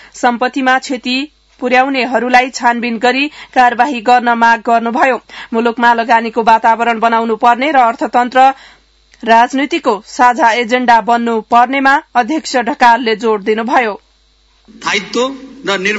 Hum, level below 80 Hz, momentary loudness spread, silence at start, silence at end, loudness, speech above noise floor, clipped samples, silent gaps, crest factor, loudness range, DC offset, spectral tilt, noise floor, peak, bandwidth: none; -54 dBFS; 8 LU; 0.15 s; 0 s; -12 LUFS; 40 dB; 0.3%; none; 12 dB; 2 LU; under 0.1%; -3.5 dB/octave; -52 dBFS; 0 dBFS; 8 kHz